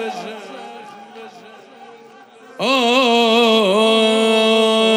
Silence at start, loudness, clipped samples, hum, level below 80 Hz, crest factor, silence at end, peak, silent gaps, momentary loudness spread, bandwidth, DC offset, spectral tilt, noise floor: 0 s; -14 LUFS; under 0.1%; none; -80 dBFS; 14 dB; 0 s; -2 dBFS; none; 21 LU; 14.5 kHz; under 0.1%; -3.5 dB/octave; -43 dBFS